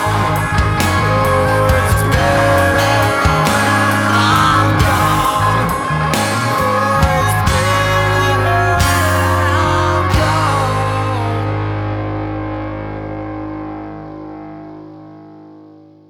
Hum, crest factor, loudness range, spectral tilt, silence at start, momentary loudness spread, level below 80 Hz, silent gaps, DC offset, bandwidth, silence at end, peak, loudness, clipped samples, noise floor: 50 Hz at -40 dBFS; 14 dB; 12 LU; -5 dB/octave; 0 s; 13 LU; -28 dBFS; none; under 0.1%; 19 kHz; 0.4 s; 0 dBFS; -14 LUFS; under 0.1%; -41 dBFS